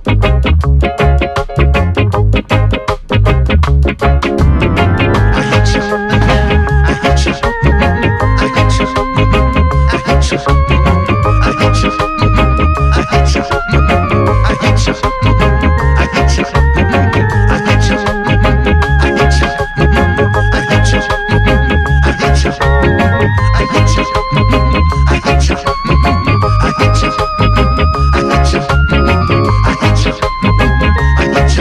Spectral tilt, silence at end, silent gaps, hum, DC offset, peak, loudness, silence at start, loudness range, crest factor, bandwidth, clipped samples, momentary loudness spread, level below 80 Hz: -6 dB/octave; 0 s; none; none; under 0.1%; 0 dBFS; -11 LUFS; 0 s; 0 LU; 8 dB; 11 kHz; under 0.1%; 2 LU; -14 dBFS